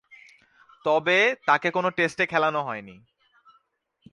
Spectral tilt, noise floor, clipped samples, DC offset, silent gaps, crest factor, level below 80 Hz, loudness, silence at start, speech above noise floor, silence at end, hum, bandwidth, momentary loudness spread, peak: -4.5 dB/octave; -70 dBFS; under 0.1%; under 0.1%; none; 20 dB; -70 dBFS; -23 LUFS; 0.85 s; 46 dB; 1.2 s; none; 11.5 kHz; 11 LU; -6 dBFS